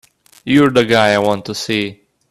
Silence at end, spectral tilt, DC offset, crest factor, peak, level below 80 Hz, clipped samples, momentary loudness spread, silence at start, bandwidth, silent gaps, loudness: 0.4 s; -5 dB/octave; under 0.1%; 16 dB; 0 dBFS; -52 dBFS; under 0.1%; 11 LU; 0.45 s; 14 kHz; none; -14 LUFS